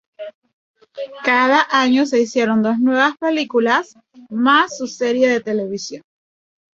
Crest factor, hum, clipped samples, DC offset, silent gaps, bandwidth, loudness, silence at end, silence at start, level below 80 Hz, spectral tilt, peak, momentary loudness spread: 18 dB; none; under 0.1%; under 0.1%; 0.34-0.42 s, 0.53-0.74 s; 7.6 kHz; -16 LUFS; 0.75 s; 0.2 s; -66 dBFS; -4 dB/octave; -2 dBFS; 18 LU